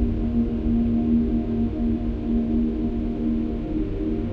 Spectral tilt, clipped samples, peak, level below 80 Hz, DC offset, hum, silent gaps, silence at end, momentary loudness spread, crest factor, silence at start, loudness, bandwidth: -10.5 dB/octave; under 0.1%; -10 dBFS; -30 dBFS; under 0.1%; none; none; 0 s; 5 LU; 12 dB; 0 s; -24 LUFS; 4.5 kHz